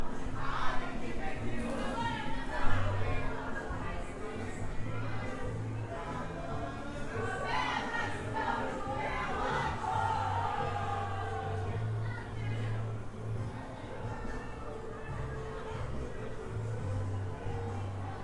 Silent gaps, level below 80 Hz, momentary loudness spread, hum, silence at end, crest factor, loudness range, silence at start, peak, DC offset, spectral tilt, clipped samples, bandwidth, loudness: none; -44 dBFS; 8 LU; none; 0 s; 20 dB; 6 LU; 0 s; -14 dBFS; under 0.1%; -6 dB/octave; under 0.1%; 11 kHz; -37 LUFS